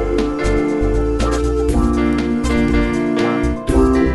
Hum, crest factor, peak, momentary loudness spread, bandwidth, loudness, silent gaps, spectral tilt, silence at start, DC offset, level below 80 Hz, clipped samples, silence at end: none; 14 dB; -2 dBFS; 3 LU; 11.5 kHz; -17 LUFS; none; -7 dB/octave; 0 s; under 0.1%; -22 dBFS; under 0.1%; 0 s